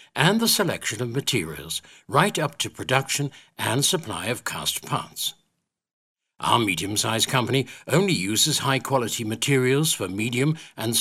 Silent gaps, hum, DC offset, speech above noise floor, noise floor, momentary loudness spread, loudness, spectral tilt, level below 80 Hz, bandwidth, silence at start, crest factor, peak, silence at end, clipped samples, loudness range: 5.93-6.15 s; none; under 0.1%; 52 dB; -76 dBFS; 9 LU; -23 LUFS; -3.5 dB/octave; -60 dBFS; 16 kHz; 0.15 s; 22 dB; -4 dBFS; 0 s; under 0.1%; 4 LU